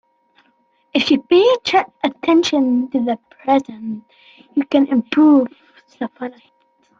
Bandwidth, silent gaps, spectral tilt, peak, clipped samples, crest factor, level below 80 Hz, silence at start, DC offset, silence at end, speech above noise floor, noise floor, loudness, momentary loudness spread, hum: 7.6 kHz; none; -4.5 dB/octave; -2 dBFS; under 0.1%; 16 dB; -62 dBFS; 0.95 s; under 0.1%; 0.7 s; 45 dB; -61 dBFS; -16 LUFS; 16 LU; none